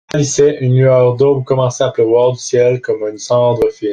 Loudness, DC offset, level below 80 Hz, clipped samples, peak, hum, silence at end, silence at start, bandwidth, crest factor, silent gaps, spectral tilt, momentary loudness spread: -13 LUFS; under 0.1%; -48 dBFS; under 0.1%; -2 dBFS; none; 0 s; 0.15 s; 9.4 kHz; 12 dB; none; -6 dB/octave; 5 LU